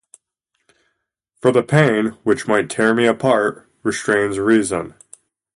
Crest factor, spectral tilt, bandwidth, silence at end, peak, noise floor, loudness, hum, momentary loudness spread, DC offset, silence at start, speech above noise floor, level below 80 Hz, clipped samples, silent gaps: 18 dB; -5.5 dB/octave; 11.5 kHz; 0.7 s; 0 dBFS; -73 dBFS; -17 LUFS; none; 9 LU; under 0.1%; 1.45 s; 56 dB; -56 dBFS; under 0.1%; none